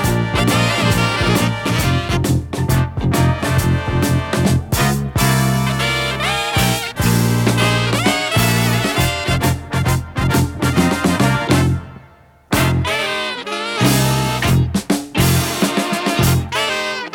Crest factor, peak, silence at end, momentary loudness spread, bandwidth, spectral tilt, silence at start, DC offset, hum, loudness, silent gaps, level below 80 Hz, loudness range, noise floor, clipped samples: 16 dB; 0 dBFS; 0 s; 4 LU; 18 kHz; -5 dB/octave; 0 s; under 0.1%; none; -16 LUFS; none; -32 dBFS; 2 LU; -46 dBFS; under 0.1%